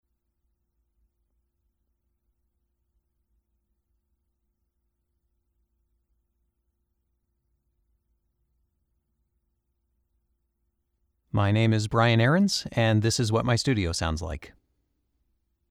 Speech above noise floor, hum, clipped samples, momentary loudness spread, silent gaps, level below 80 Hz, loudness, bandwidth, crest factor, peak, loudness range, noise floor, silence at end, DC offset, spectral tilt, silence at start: 53 dB; none; under 0.1%; 10 LU; none; -50 dBFS; -24 LUFS; 13.5 kHz; 22 dB; -8 dBFS; 7 LU; -77 dBFS; 1.2 s; under 0.1%; -5.5 dB/octave; 11.35 s